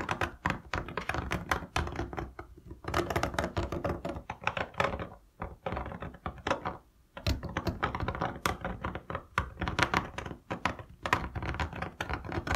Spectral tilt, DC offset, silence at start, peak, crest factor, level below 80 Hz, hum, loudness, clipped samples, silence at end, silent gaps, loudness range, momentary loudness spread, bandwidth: -5 dB/octave; under 0.1%; 0 s; -4 dBFS; 30 dB; -46 dBFS; none; -35 LUFS; under 0.1%; 0 s; none; 3 LU; 10 LU; 16 kHz